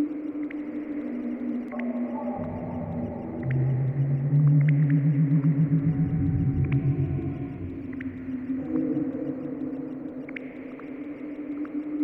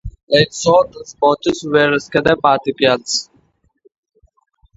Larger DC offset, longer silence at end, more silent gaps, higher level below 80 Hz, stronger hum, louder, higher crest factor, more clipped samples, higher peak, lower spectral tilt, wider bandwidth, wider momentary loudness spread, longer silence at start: neither; second, 0 s vs 1.55 s; second, none vs 0.23-0.27 s; about the same, -48 dBFS vs -44 dBFS; neither; second, -27 LUFS vs -15 LUFS; about the same, 14 dB vs 16 dB; neither; second, -12 dBFS vs 0 dBFS; first, -12.5 dB/octave vs -4 dB/octave; second, 3.2 kHz vs 8 kHz; first, 14 LU vs 5 LU; about the same, 0 s vs 0.05 s